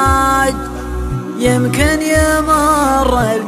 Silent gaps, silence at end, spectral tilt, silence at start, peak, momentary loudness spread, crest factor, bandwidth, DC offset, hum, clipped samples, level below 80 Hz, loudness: none; 0 s; -5 dB/octave; 0 s; 0 dBFS; 10 LU; 14 dB; 15 kHz; under 0.1%; none; under 0.1%; -24 dBFS; -14 LUFS